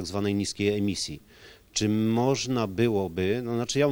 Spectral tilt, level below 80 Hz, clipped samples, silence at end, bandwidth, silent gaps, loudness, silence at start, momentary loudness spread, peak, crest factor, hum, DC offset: -5 dB/octave; -58 dBFS; under 0.1%; 0 s; over 20 kHz; none; -27 LUFS; 0 s; 7 LU; -10 dBFS; 16 dB; none; under 0.1%